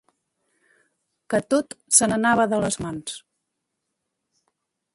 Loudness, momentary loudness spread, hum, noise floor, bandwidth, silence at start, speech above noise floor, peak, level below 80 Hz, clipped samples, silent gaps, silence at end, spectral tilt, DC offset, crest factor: -21 LUFS; 16 LU; none; -80 dBFS; 12 kHz; 1.3 s; 58 dB; -2 dBFS; -58 dBFS; under 0.1%; none; 1.75 s; -3 dB/octave; under 0.1%; 24 dB